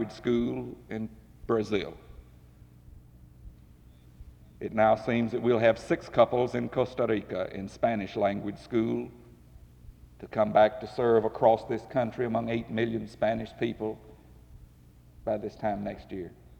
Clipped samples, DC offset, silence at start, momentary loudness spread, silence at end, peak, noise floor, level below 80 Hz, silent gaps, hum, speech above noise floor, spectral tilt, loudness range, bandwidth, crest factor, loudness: under 0.1%; under 0.1%; 0 s; 14 LU; 0.05 s; -10 dBFS; -55 dBFS; -54 dBFS; none; none; 27 dB; -7.5 dB/octave; 9 LU; 10.5 kHz; 20 dB; -29 LUFS